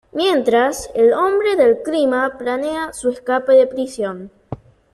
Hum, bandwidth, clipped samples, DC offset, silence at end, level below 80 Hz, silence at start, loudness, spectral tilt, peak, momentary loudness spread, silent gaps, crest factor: none; 13 kHz; under 0.1%; under 0.1%; 0.4 s; -52 dBFS; 0.15 s; -17 LUFS; -4 dB/octave; -4 dBFS; 16 LU; none; 14 dB